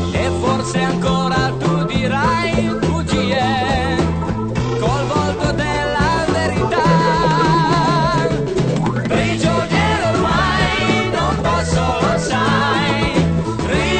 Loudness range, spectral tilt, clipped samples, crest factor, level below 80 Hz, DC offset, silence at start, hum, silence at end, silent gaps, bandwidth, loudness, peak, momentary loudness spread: 2 LU; -5.5 dB/octave; under 0.1%; 12 dB; -30 dBFS; under 0.1%; 0 s; none; 0 s; none; 9.2 kHz; -17 LUFS; -4 dBFS; 4 LU